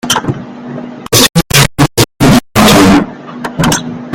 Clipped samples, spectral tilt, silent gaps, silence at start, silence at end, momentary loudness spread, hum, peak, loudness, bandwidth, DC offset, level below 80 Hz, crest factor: 0.6%; -4 dB/octave; none; 0.05 s; 0 s; 17 LU; none; 0 dBFS; -8 LUFS; over 20 kHz; under 0.1%; -28 dBFS; 10 dB